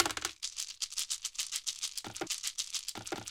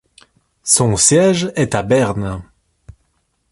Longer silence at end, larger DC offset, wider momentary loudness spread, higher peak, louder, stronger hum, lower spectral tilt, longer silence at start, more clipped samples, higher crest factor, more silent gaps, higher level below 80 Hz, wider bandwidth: second, 0 s vs 1.1 s; neither; second, 4 LU vs 15 LU; second, -6 dBFS vs 0 dBFS; second, -36 LUFS vs -14 LUFS; neither; second, 0 dB/octave vs -4 dB/octave; second, 0 s vs 0.65 s; neither; first, 32 dB vs 18 dB; neither; second, -68 dBFS vs -42 dBFS; first, 17 kHz vs 12 kHz